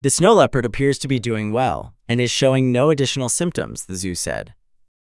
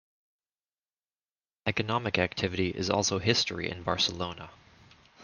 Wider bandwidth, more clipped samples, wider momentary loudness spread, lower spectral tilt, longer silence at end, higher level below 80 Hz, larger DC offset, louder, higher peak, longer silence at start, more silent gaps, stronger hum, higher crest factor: first, 12 kHz vs 10.5 kHz; neither; first, 13 LU vs 10 LU; about the same, -4.5 dB/octave vs -3.5 dB/octave; first, 0.55 s vs 0 s; first, -44 dBFS vs -62 dBFS; neither; first, -19 LUFS vs -29 LUFS; first, 0 dBFS vs -6 dBFS; second, 0.05 s vs 1.65 s; neither; neither; second, 20 dB vs 26 dB